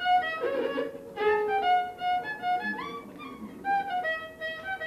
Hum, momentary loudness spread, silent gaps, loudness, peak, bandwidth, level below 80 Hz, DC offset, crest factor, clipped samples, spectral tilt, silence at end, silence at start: none; 12 LU; none; -29 LUFS; -14 dBFS; 14 kHz; -64 dBFS; under 0.1%; 14 dB; under 0.1%; -4.5 dB/octave; 0 s; 0 s